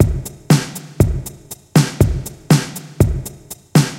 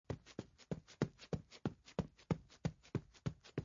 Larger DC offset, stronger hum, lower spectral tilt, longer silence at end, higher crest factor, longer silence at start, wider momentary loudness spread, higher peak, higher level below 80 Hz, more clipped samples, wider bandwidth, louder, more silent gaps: neither; neither; about the same, -6 dB/octave vs -7 dB/octave; about the same, 0 s vs 0 s; second, 16 dB vs 26 dB; about the same, 0 s vs 0.1 s; first, 14 LU vs 7 LU; first, 0 dBFS vs -20 dBFS; first, -28 dBFS vs -64 dBFS; neither; first, 17 kHz vs 7.2 kHz; first, -17 LUFS vs -46 LUFS; neither